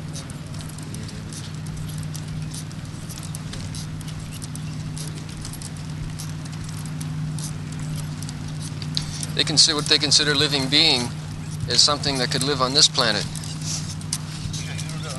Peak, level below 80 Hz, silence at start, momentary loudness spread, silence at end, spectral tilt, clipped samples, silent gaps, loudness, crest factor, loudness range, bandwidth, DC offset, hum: -2 dBFS; -44 dBFS; 0 s; 17 LU; 0 s; -3 dB/octave; under 0.1%; none; -22 LUFS; 22 dB; 14 LU; 12 kHz; under 0.1%; none